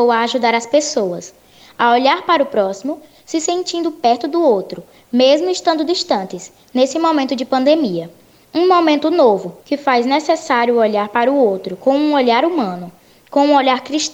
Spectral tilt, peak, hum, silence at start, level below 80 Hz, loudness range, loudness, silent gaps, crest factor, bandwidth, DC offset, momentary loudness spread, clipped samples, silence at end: -3.5 dB/octave; 0 dBFS; none; 0 s; -64 dBFS; 2 LU; -15 LUFS; none; 14 dB; 16 kHz; under 0.1%; 11 LU; under 0.1%; 0 s